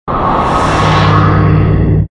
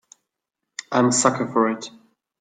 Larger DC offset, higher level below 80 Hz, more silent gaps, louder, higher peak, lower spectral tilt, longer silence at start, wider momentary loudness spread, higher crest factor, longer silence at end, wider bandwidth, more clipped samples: neither; first, -20 dBFS vs -66 dBFS; neither; first, -10 LUFS vs -20 LUFS; about the same, 0 dBFS vs -2 dBFS; first, -7 dB/octave vs -4 dB/octave; second, 0.05 s vs 0.8 s; second, 3 LU vs 19 LU; second, 10 dB vs 22 dB; second, 0.05 s vs 0.5 s; about the same, 10.5 kHz vs 9.8 kHz; neither